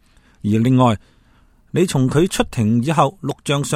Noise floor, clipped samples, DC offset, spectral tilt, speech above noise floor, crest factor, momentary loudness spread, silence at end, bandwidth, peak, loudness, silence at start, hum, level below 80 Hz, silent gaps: -53 dBFS; under 0.1%; under 0.1%; -6 dB/octave; 36 dB; 18 dB; 10 LU; 0 s; 15.5 kHz; 0 dBFS; -18 LUFS; 0.45 s; none; -42 dBFS; none